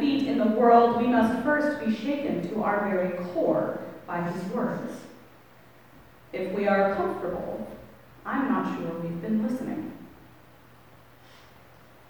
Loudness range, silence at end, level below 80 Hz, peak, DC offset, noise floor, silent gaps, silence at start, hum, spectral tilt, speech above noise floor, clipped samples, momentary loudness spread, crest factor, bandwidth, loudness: 8 LU; 2 s; -62 dBFS; -6 dBFS; 0.2%; -54 dBFS; none; 0 s; none; -7.5 dB/octave; 28 dB; under 0.1%; 16 LU; 20 dB; over 20 kHz; -26 LUFS